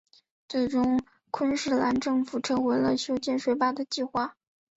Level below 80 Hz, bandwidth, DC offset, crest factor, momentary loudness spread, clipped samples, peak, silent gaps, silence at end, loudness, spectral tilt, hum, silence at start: -60 dBFS; 8 kHz; under 0.1%; 16 dB; 6 LU; under 0.1%; -12 dBFS; none; 0.45 s; -27 LUFS; -4.5 dB/octave; none; 0.5 s